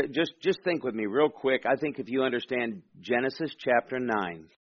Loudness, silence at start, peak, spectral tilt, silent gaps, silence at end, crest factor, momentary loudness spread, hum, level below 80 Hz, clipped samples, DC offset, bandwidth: -29 LUFS; 0 s; -10 dBFS; -3 dB/octave; none; 0.2 s; 18 dB; 5 LU; none; -70 dBFS; under 0.1%; under 0.1%; 6.8 kHz